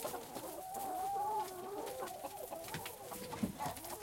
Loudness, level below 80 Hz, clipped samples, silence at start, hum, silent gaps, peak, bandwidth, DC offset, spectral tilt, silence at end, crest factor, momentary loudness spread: -43 LUFS; -68 dBFS; under 0.1%; 0 s; none; none; -24 dBFS; 17 kHz; under 0.1%; -4 dB/octave; 0 s; 20 dB; 7 LU